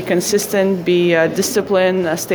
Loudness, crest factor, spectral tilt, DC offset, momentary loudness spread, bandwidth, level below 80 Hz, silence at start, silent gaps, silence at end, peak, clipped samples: -15 LUFS; 14 dB; -4.5 dB/octave; under 0.1%; 3 LU; over 20 kHz; -56 dBFS; 0 s; none; 0 s; 0 dBFS; under 0.1%